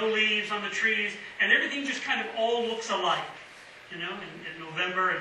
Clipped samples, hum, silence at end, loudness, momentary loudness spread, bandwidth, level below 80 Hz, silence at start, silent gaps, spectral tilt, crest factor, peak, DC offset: under 0.1%; none; 0 s; -27 LUFS; 16 LU; 11.5 kHz; -74 dBFS; 0 s; none; -2.5 dB/octave; 22 dB; -8 dBFS; under 0.1%